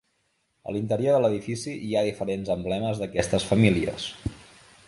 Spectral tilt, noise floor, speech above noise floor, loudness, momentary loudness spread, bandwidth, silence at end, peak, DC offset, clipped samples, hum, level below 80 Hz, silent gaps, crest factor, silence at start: -6 dB/octave; -72 dBFS; 47 dB; -26 LUFS; 12 LU; 11.5 kHz; 0.45 s; -4 dBFS; under 0.1%; under 0.1%; none; -48 dBFS; none; 22 dB; 0.65 s